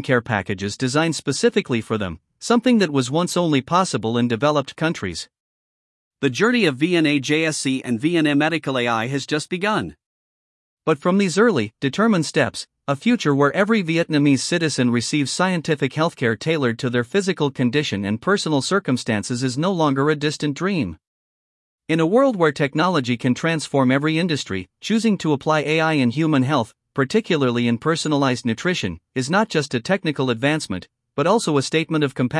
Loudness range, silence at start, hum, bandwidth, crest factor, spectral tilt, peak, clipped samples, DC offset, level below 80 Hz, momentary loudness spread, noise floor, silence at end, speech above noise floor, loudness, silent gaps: 3 LU; 0 s; none; 12 kHz; 18 dB; -5 dB/octave; -2 dBFS; under 0.1%; under 0.1%; -62 dBFS; 6 LU; under -90 dBFS; 0 s; over 70 dB; -20 LUFS; 5.40-6.11 s, 10.06-10.77 s, 21.07-21.78 s